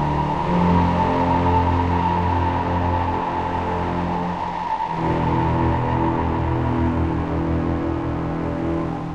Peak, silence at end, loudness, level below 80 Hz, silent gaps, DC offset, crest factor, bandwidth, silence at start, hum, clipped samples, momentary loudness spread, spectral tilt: -6 dBFS; 0 s; -21 LUFS; -32 dBFS; none; under 0.1%; 14 dB; 7.6 kHz; 0 s; none; under 0.1%; 6 LU; -8.5 dB/octave